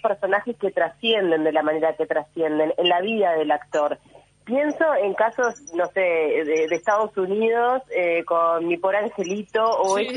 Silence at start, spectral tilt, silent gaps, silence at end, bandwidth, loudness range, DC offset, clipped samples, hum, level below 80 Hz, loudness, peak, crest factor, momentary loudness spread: 0.05 s; -4 dB/octave; none; 0 s; 10.5 kHz; 1 LU; under 0.1%; under 0.1%; none; -68 dBFS; -22 LUFS; -8 dBFS; 14 dB; 5 LU